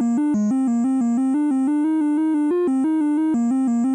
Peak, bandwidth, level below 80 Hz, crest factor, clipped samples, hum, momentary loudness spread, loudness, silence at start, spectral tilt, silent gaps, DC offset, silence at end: -14 dBFS; 10.5 kHz; -70 dBFS; 6 dB; under 0.1%; none; 0 LU; -20 LUFS; 0 s; -7.5 dB/octave; none; under 0.1%; 0 s